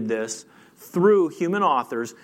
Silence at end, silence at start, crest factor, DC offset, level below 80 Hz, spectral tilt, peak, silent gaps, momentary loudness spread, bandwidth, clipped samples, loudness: 0.1 s; 0 s; 16 dB; under 0.1%; -78 dBFS; -5.5 dB/octave; -8 dBFS; none; 12 LU; 16 kHz; under 0.1%; -22 LUFS